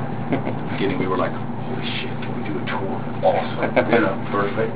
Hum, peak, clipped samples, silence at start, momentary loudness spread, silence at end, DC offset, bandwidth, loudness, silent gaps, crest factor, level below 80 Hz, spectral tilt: none; -2 dBFS; under 0.1%; 0 s; 8 LU; 0 s; 3%; 4 kHz; -23 LUFS; none; 20 dB; -52 dBFS; -10.5 dB/octave